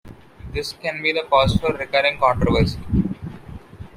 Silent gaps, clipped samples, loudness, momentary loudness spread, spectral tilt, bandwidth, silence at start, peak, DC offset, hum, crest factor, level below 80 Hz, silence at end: none; under 0.1%; -20 LUFS; 18 LU; -6 dB/octave; 16 kHz; 0.05 s; -4 dBFS; under 0.1%; none; 18 dB; -34 dBFS; 0.1 s